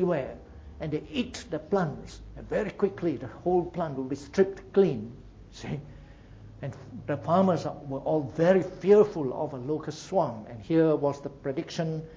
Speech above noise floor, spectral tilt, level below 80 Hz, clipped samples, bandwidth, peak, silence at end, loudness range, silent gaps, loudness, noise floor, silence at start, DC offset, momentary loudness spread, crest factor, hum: 21 dB; -7.5 dB/octave; -52 dBFS; under 0.1%; 8 kHz; -8 dBFS; 0 s; 5 LU; none; -28 LUFS; -48 dBFS; 0 s; under 0.1%; 17 LU; 20 dB; none